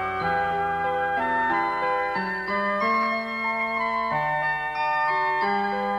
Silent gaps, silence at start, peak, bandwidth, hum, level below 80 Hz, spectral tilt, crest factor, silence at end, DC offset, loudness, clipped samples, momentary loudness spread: none; 0 s; -14 dBFS; 14.5 kHz; none; -56 dBFS; -6 dB/octave; 12 dB; 0 s; under 0.1%; -24 LUFS; under 0.1%; 3 LU